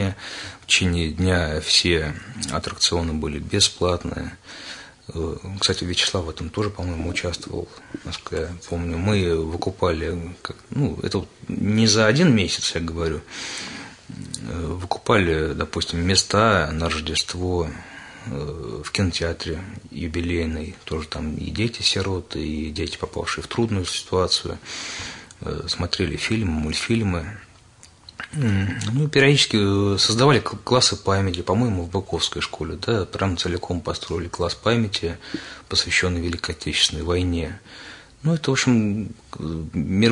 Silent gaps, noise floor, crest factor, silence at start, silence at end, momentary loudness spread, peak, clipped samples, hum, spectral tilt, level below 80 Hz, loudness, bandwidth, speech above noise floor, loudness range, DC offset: none; -50 dBFS; 20 dB; 0 s; 0 s; 15 LU; -2 dBFS; under 0.1%; none; -4 dB/octave; -44 dBFS; -22 LUFS; 11 kHz; 27 dB; 6 LU; under 0.1%